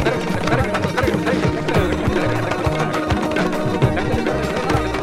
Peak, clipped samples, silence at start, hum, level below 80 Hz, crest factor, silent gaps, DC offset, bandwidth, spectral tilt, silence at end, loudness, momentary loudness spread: -4 dBFS; under 0.1%; 0 s; none; -32 dBFS; 16 dB; none; under 0.1%; 16 kHz; -6 dB/octave; 0 s; -19 LUFS; 2 LU